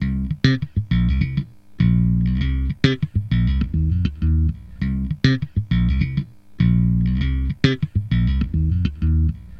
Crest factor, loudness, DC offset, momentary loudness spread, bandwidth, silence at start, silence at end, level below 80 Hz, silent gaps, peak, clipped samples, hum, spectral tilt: 18 dB; -21 LUFS; under 0.1%; 6 LU; 6.8 kHz; 0 s; 0 s; -24 dBFS; none; 0 dBFS; under 0.1%; none; -8 dB/octave